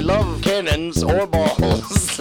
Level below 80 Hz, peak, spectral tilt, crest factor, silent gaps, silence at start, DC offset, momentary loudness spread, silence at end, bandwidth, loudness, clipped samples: -28 dBFS; -2 dBFS; -5 dB/octave; 16 dB; none; 0 s; under 0.1%; 2 LU; 0 s; 19.5 kHz; -19 LUFS; under 0.1%